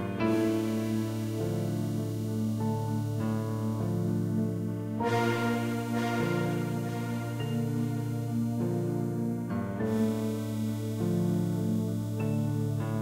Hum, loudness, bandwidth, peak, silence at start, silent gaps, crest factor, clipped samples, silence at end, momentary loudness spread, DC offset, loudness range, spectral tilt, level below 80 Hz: none; -31 LUFS; 16 kHz; -16 dBFS; 0 s; none; 14 dB; under 0.1%; 0 s; 4 LU; under 0.1%; 1 LU; -7.5 dB/octave; -60 dBFS